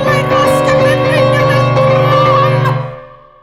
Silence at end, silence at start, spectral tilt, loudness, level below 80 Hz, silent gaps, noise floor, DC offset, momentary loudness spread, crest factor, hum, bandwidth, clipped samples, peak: 0.3 s; 0 s; -6.5 dB/octave; -10 LUFS; -38 dBFS; none; -33 dBFS; under 0.1%; 5 LU; 10 dB; none; 14.5 kHz; under 0.1%; -2 dBFS